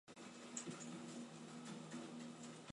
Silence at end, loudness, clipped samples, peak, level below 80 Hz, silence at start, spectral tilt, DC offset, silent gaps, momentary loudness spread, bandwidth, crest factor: 0 s; -52 LUFS; under 0.1%; -32 dBFS; -90 dBFS; 0.05 s; -4 dB/octave; under 0.1%; none; 5 LU; 11.5 kHz; 22 dB